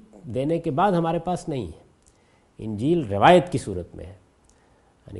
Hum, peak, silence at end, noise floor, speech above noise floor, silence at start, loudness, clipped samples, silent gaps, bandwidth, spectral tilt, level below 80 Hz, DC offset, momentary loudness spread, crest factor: none; 0 dBFS; 0 s; -59 dBFS; 37 dB; 0.15 s; -22 LUFS; under 0.1%; none; 11.5 kHz; -6.5 dB/octave; -52 dBFS; under 0.1%; 22 LU; 24 dB